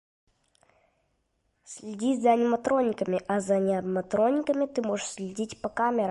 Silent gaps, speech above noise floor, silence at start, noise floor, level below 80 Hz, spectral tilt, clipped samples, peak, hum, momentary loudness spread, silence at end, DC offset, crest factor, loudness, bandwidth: none; 48 dB; 1.7 s; -74 dBFS; -66 dBFS; -5.5 dB/octave; under 0.1%; -10 dBFS; none; 11 LU; 0 s; under 0.1%; 18 dB; -27 LUFS; 11.5 kHz